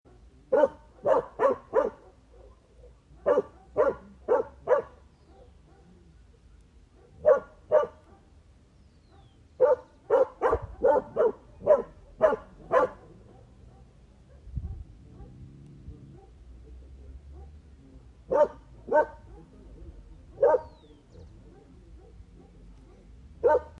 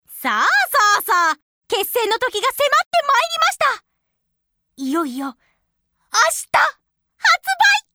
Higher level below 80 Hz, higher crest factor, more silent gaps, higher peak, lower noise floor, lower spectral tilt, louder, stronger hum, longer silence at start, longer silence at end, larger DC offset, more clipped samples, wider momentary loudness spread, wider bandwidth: first, -52 dBFS vs -64 dBFS; about the same, 20 dB vs 16 dB; second, none vs 1.42-1.61 s, 2.86-2.91 s; second, -10 dBFS vs -2 dBFS; second, -57 dBFS vs -74 dBFS; first, -7.5 dB/octave vs 0 dB/octave; second, -27 LUFS vs -17 LUFS; neither; first, 0.5 s vs 0.1 s; about the same, 0.1 s vs 0.15 s; neither; neither; first, 25 LU vs 10 LU; second, 7.4 kHz vs over 20 kHz